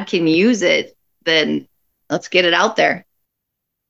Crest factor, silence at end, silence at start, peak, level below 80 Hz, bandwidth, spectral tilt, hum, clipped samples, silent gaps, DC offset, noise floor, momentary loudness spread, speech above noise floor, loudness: 18 dB; 0.9 s; 0 s; 0 dBFS; -70 dBFS; 8 kHz; -4 dB/octave; none; under 0.1%; none; under 0.1%; -78 dBFS; 11 LU; 62 dB; -16 LUFS